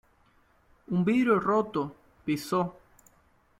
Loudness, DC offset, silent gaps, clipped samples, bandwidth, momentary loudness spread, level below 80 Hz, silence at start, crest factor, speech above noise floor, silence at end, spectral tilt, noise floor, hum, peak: -28 LUFS; under 0.1%; none; under 0.1%; 16 kHz; 11 LU; -64 dBFS; 0.9 s; 18 dB; 38 dB; 0.9 s; -7 dB/octave; -64 dBFS; none; -10 dBFS